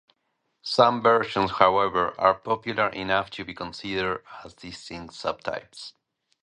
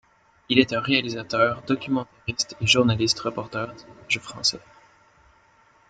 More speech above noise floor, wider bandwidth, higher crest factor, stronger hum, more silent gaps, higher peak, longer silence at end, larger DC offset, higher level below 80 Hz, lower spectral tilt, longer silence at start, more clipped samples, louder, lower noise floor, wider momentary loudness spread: first, 51 dB vs 34 dB; first, 11 kHz vs 9.4 kHz; about the same, 24 dB vs 24 dB; neither; neither; about the same, -2 dBFS vs -2 dBFS; second, 0.55 s vs 1.3 s; neither; about the same, -56 dBFS vs -56 dBFS; about the same, -5 dB/octave vs -4 dB/octave; first, 0.65 s vs 0.5 s; neither; about the same, -24 LUFS vs -23 LUFS; first, -76 dBFS vs -58 dBFS; first, 20 LU vs 12 LU